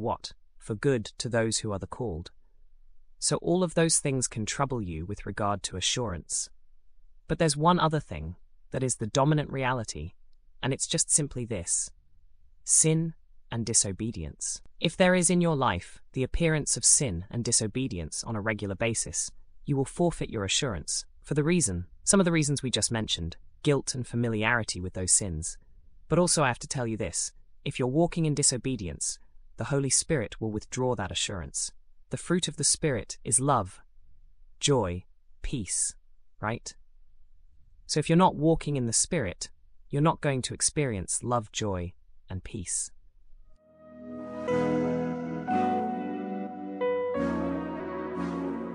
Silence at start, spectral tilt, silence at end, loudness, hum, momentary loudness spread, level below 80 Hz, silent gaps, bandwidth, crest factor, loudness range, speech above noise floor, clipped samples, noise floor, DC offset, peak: 0 s; -4 dB/octave; 0 s; -28 LUFS; none; 13 LU; -48 dBFS; none; 13 kHz; 22 dB; 5 LU; 26 dB; under 0.1%; -54 dBFS; under 0.1%; -8 dBFS